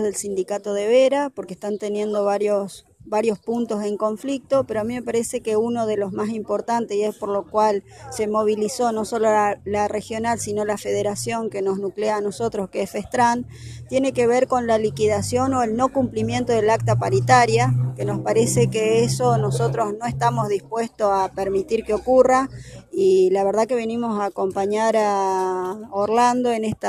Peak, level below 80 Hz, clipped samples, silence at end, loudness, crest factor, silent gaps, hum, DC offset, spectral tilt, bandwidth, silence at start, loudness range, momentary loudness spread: -2 dBFS; -52 dBFS; under 0.1%; 0 s; -21 LUFS; 18 dB; none; none; under 0.1%; -5.5 dB/octave; 14 kHz; 0 s; 4 LU; 8 LU